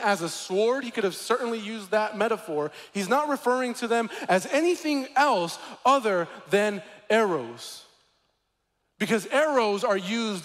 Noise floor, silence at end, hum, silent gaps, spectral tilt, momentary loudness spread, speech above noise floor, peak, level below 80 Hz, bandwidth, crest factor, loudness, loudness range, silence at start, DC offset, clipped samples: -76 dBFS; 0 s; none; none; -4 dB/octave; 10 LU; 50 dB; -10 dBFS; -76 dBFS; 16 kHz; 16 dB; -26 LUFS; 3 LU; 0 s; under 0.1%; under 0.1%